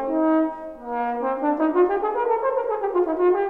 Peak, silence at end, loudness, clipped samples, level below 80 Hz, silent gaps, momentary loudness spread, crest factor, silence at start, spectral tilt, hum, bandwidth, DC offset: -8 dBFS; 0 s; -22 LUFS; under 0.1%; -56 dBFS; none; 7 LU; 14 dB; 0 s; -7.5 dB/octave; 50 Hz at -65 dBFS; 4 kHz; 0.2%